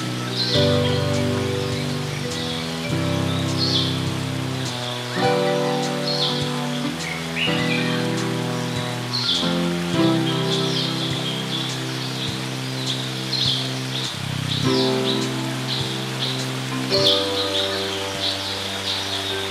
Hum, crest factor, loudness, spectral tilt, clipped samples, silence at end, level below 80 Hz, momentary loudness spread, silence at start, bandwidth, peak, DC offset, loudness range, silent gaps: none; 14 dB; -22 LUFS; -4.5 dB/octave; under 0.1%; 0 s; -54 dBFS; 6 LU; 0 s; 16 kHz; -8 dBFS; under 0.1%; 2 LU; none